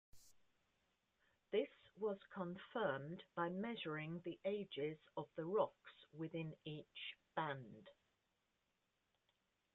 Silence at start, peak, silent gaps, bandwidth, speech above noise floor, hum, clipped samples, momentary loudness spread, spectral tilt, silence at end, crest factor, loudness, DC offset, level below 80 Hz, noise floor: 0.15 s; -26 dBFS; none; 7.4 kHz; 41 dB; none; under 0.1%; 9 LU; -4.5 dB/octave; 1.8 s; 22 dB; -46 LUFS; under 0.1%; -84 dBFS; -87 dBFS